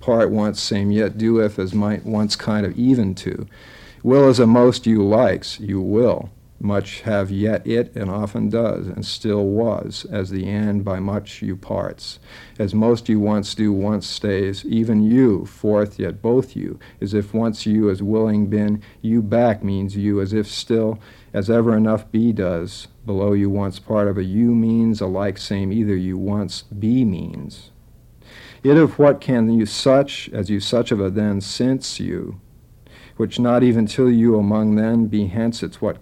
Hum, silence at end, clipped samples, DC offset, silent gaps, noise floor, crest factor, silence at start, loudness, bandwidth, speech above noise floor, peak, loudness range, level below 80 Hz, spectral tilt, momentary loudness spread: none; 0.05 s; under 0.1%; under 0.1%; none; -47 dBFS; 16 dB; 0 s; -19 LUFS; 11.5 kHz; 29 dB; -2 dBFS; 6 LU; -48 dBFS; -7 dB/octave; 11 LU